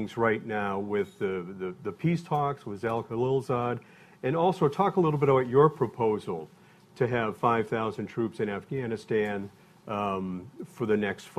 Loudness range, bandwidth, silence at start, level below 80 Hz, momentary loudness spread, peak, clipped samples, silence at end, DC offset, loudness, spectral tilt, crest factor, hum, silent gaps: 5 LU; 13.5 kHz; 0 s; -62 dBFS; 12 LU; -10 dBFS; under 0.1%; 0.05 s; under 0.1%; -29 LUFS; -7.5 dB/octave; 20 dB; none; none